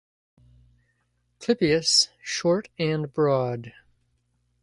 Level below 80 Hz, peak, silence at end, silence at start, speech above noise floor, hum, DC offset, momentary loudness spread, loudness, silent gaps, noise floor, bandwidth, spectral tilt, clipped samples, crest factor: -60 dBFS; -8 dBFS; 0.95 s; 1.4 s; 48 dB; 60 Hz at -55 dBFS; under 0.1%; 11 LU; -23 LUFS; none; -71 dBFS; 11.5 kHz; -4 dB/octave; under 0.1%; 20 dB